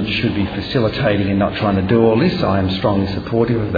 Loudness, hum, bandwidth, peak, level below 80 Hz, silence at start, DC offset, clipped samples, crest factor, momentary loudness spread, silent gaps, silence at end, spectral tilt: -17 LUFS; none; 5 kHz; 0 dBFS; -38 dBFS; 0 s; under 0.1%; under 0.1%; 16 dB; 5 LU; none; 0 s; -8.5 dB/octave